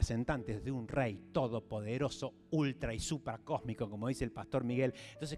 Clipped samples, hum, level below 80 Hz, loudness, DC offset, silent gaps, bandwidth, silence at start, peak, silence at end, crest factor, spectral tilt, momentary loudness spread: under 0.1%; none; -50 dBFS; -38 LUFS; under 0.1%; none; 13 kHz; 0 s; -18 dBFS; 0 s; 18 dB; -6 dB/octave; 5 LU